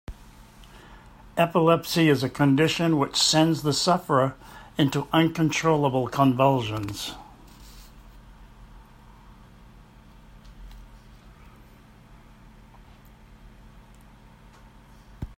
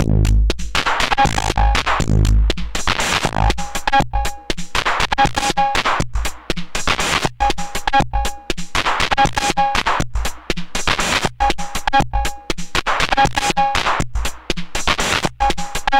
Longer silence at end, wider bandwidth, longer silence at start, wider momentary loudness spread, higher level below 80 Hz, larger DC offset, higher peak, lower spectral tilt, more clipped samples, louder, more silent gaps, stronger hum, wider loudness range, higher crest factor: about the same, 0.05 s vs 0 s; about the same, 16 kHz vs 16.5 kHz; about the same, 0.1 s vs 0 s; first, 14 LU vs 8 LU; second, -50 dBFS vs -24 dBFS; neither; second, -4 dBFS vs 0 dBFS; first, -5 dB/octave vs -3.5 dB/octave; neither; second, -23 LUFS vs -18 LUFS; neither; neither; first, 8 LU vs 2 LU; first, 22 dB vs 16 dB